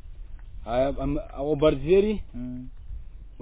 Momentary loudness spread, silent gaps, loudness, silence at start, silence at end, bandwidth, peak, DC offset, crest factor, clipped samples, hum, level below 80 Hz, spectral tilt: 23 LU; none; -25 LUFS; 0.05 s; 0 s; 4 kHz; -8 dBFS; under 0.1%; 18 dB; under 0.1%; none; -38 dBFS; -11 dB/octave